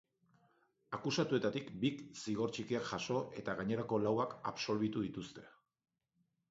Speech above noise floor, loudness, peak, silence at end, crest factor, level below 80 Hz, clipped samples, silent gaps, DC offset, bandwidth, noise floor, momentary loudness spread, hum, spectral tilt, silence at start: 44 dB; -39 LUFS; -20 dBFS; 1 s; 18 dB; -72 dBFS; under 0.1%; none; under 0.1%; 7.6 kHz; -82 dBFS; 9 LU; none; -5 dB/octave; 0.9 s